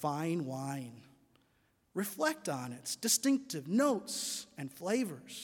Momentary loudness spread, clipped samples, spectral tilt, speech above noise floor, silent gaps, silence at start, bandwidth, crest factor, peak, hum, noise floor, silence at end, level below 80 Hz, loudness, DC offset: 12 LU; under 0.1%; -3.5 dB/octave; 38 dB; none; 0 s; 18 kHz; 22 dB; -14 dBFS; none; -73 dBFS; 0 s; -80 dBFS; -35 LUFS; under 0.1%